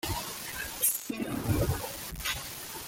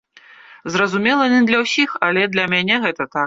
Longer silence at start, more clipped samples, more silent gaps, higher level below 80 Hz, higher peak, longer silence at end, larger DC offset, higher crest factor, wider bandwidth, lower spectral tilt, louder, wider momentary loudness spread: second, 0.05 s vs 0.5 s; neither; neither; first, -46 dBFS vs -60 dBFS; second, -14 dBFS vs -2 dBFS; about the same, 0 s vs 0 s; neither; about the same, 20 dB vs 16 dB; first, 17 kHz vs 7.8 kHz; about the same, -3.5 dB/octave vs -4.5 dB/octave; second, -32 LUFS vs -16 LUFS; first, 9 LU vs 6 LU